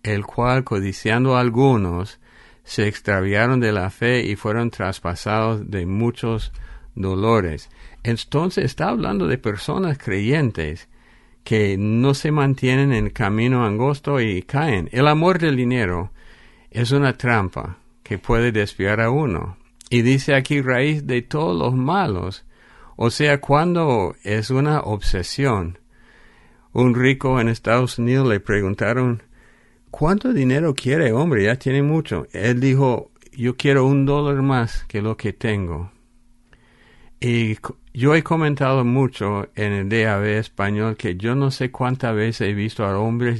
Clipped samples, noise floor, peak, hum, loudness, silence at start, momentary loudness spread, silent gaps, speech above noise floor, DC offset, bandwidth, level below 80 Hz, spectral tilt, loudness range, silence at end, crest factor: under 0.1%; -53 dBFS; -2 dBFS; none; -20 LUFS; 0.05 s; 9 LU; none; 34 dB; under 0.1%; 11.5 kHz; -38 dBFS; -7 dB/octave; 4 LU; 0 s; 16 dB